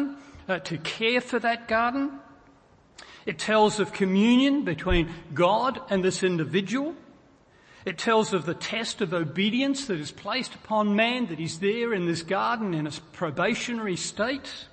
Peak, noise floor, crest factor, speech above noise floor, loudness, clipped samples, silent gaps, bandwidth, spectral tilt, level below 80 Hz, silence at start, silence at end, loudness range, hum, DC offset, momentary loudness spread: -8 dBFS; -57 dBFS; 18 dB; 31 dB; -26 LUFS; under 0.1%; none; 8.8 kHz; -5 dB/octave; -46 dBFS; 0 s; 0.05 s; 4 LU; none; under 0.1%; 10 LU